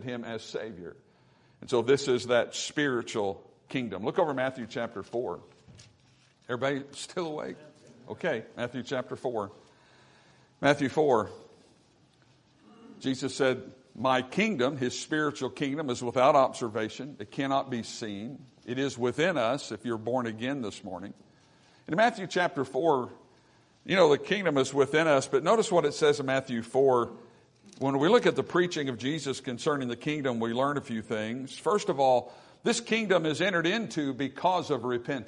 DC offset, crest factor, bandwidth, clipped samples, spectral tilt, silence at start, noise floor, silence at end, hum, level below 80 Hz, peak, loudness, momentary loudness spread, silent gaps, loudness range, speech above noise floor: under 0.1%; 22 dB; 11 kHz; under 0.1%; -5 dB/octave; 0 s; -63 dBFS; 0 s; none; -72 dBFS; -8 dBFS; -29 LUFS; 13 LU; none; 8 LU; 34 dB